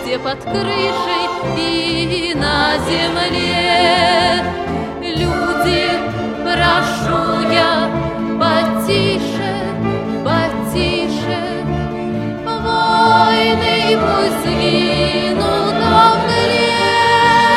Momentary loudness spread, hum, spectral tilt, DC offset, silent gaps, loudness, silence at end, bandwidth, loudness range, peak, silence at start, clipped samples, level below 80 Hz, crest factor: 9 LU; none; -5 dB/octave; under 0.1%; none; -15 LUFS; 0 s; 15.5 kHz; 4 LU; 0 dBFS; 0 s; under 0.1%; -36 dBFS; 14 dB